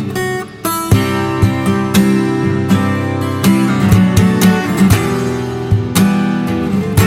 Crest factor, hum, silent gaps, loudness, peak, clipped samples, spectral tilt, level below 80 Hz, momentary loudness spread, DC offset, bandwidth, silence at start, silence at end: 12 dB; none; none; -13 LUFS; 0 dBFS; under 0.1%; -6 dB/octave; -34 dBFS; 7 LU; under 0.1%; 17 kHz; 0 s; 0 s